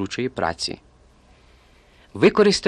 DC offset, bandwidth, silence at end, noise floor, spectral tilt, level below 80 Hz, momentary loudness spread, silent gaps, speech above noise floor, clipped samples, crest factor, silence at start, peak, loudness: under 0.1%; 11 kHz; 0 s; -53 dBFS; -4.5 dB/octave; -50 dBFS; 21 LU; none; 33 dB; under 0.1%; 20 dB; 0 s; -2 dBFS; -21 LUFS